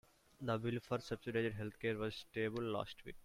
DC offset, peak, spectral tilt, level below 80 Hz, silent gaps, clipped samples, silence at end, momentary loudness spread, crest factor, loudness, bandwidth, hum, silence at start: under 0.1%; -24 dBFS; -6.5 dB/octave; -66 dBFS; none; under 0.1%; 0.05 s; 4 LU; 18 dB; -42 LUFS; 16 kHz; none; 0.4 s